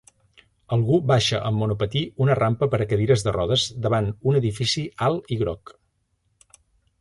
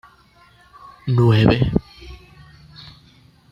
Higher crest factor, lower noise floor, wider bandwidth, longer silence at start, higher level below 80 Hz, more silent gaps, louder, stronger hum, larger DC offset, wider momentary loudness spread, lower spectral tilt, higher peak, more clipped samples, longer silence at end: about the same, 18 dB vs 20 dB; first, -70 dBFS vs -52 dBFS; first, 11.5 kHz vs 6 kHz; second, 0.7 s vs 1.05 s; second, -46 dBFS vs -38 dBFS; neither; second, -22 LUFS vs -17 LUFS; neither; neither; second, 6 LU vs 27 LU; second, -6 dB/octave vs -8.5 dB/octave; second, -6 dBFS vs -2 dBFS; neither; about the same, 1.45 s vs 1.35 s